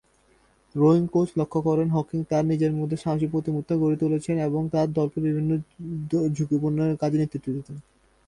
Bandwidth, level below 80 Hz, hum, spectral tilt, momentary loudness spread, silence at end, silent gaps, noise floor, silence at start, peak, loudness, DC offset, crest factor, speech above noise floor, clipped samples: 10.5 kHz; -56 dBFS; none; -9 dB/octave; 9 LU; 0.45 s; none; -62 dBFS; 0.75 s; -8 dBFS; -25 LUFS; under 0.1%; 16 dB; 38 dB; under 0.1%